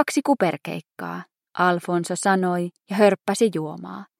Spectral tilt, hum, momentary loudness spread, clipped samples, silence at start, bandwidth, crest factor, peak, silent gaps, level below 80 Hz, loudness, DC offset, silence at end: -5 dB/octave; none; 14 LU; under 0.1%; 0 s; 15.5 kHz; 20 dB; -4 dBFS; none; -78 dBFS; -22 LUFS; under 0.1%; 0.15 s